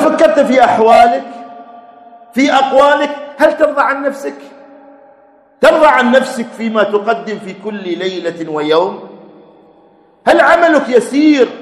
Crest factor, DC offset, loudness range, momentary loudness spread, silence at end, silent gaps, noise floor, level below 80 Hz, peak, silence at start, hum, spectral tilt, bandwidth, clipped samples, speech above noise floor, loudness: 12 dB; under 0.1%; 6 LU; 15 LU; 0 s; none; -47 dBFS; -52 dBFS; 0 dBFS; 0 s; none; -4.5 dB/octave; 13 kHz; 0.7%; 36 dB; -11 LUFS